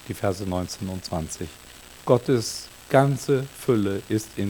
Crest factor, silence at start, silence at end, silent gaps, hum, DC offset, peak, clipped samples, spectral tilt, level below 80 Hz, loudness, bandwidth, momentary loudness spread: 22 dB; 0 s; 0 s; none; none; under 0.1%; -2 dBFS; under 0.1%; -6 dB/octave; -50 dBFS; -25 LUFS; 19 kHz; 14 LU